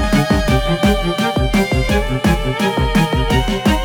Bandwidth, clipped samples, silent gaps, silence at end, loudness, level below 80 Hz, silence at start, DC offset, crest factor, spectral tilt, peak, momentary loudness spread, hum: over 20 kHz; under 0.1%; none; 0 s; -16 LUFS; -22 dBFS; 0 s; under 0.1%; 12 dB; -5.5 dB/octave; -2 dBFS; 2 LU; none